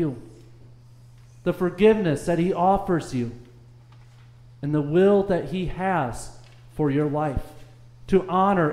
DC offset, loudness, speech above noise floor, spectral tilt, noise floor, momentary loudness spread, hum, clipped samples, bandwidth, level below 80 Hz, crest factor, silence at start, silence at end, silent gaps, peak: under 0.1%; -23 LUFS; 27 dB; -7.5 dB/octave; -48 dBFS; 15 LU; none; under 0.1%; 14 kHz; -44 dBFS; 18 dB; 0 s; 0 s; none; -6 dBFS